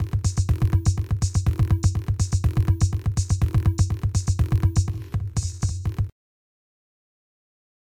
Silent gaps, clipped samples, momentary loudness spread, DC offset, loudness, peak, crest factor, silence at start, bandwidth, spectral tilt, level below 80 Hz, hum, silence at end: none; under 0.1%; 6 LU; under 0.1%; -24 LUFS; -8 dBFS; 14 dB; 0 s; 12.5 kHz; -6 dB/octave; -30 dBFS; none; 1.7 s